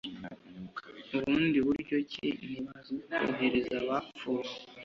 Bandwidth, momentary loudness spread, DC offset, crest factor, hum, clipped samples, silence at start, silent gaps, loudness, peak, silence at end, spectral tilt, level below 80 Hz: 7.4 kHz; 16 LU; under 0.1%; 16 dB; none; under 0.1%; 0.05 s; none; -33 LUFS; -16 dBFS; 0 s; -6.5 dB/octave; -64 dBFS